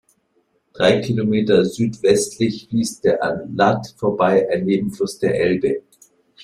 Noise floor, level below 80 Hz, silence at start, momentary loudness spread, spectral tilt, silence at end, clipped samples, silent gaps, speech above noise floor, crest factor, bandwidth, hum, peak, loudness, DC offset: -65 dBFS; -54 dBFS; 0.75 s; 6 LU; -5.5 dB/octave; 0.65 s; under 0.1%; none; 47 dB; 18 dB; 14.5 kHz; none; 0 dBFS; -19 LUFS; under 0.1%